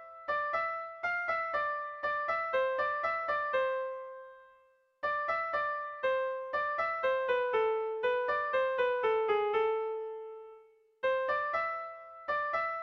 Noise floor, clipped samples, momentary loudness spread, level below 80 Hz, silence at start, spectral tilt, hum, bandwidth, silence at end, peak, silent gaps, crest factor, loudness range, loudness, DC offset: -66 dBFS; under 0.1%; 10 LU; -70 dBFS; 0 s; -4 dB/octave; none; 6.4 kHz; 0 s; -20 dBFS; none; 14 dB; 4 LU; -32 LUFS; under 0.1%